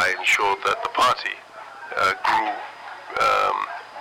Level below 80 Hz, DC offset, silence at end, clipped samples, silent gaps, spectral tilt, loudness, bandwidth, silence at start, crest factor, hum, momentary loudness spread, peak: -58 dBFS; under 0.1%; 0 s; under 0.1%; none; -1.5 dB/octave; -21 LUFS; 16.5 kHz; 0 s; 12 dB; none; 17 LU; -10 dBFS